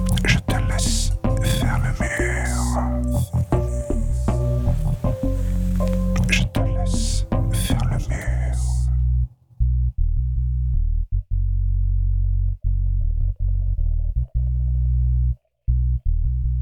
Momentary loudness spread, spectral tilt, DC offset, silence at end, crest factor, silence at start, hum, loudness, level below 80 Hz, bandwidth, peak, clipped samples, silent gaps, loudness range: 4 LU; -5.5 dB/octave; under 0.1%; 0 s; 16 dB; 0 s; none; -23 LUFS; -22 dBFS; 17 kHz; -4 dBFS; under 0.1%; none; 2 LU